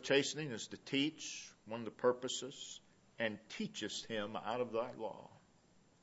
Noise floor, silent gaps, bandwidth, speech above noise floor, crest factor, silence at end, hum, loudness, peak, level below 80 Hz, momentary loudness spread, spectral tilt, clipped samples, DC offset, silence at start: -69 dBFS; none; 8 kHz; 29 dB; 22 dB; 0.65 s; none; -41 LUFS; -18 dBFS; -80 dBFS; 12 LU; -2.5 dB/octave; under 0.1%; under 0.1%; 0 s